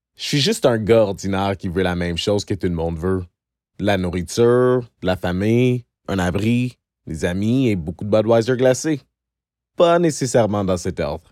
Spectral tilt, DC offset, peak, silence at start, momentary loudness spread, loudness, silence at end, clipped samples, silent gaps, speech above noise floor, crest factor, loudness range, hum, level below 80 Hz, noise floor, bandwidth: -5.5 dB/octave; under 0.1%; -4 dBFS; 0.2 s; 9 LU; -19 LUFS; 0.15 s; under 0.1%; none; 67 dB; 16 dB; 2 LU; none; -44 dBFS; -85 dBFS; 15.5 kHz